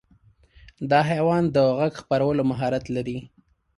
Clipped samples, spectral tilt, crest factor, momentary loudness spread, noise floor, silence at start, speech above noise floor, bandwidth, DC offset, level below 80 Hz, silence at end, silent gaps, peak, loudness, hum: under 0.1%; -7.5 dB/octave; 16 dB; 11 LU; -58 dBFS; 0.8 s; 36 dB; 11.5 kHz; under 0.1%; -54 dBFS; 0.5 s; none; -8 dBFS; -23 LUFS; none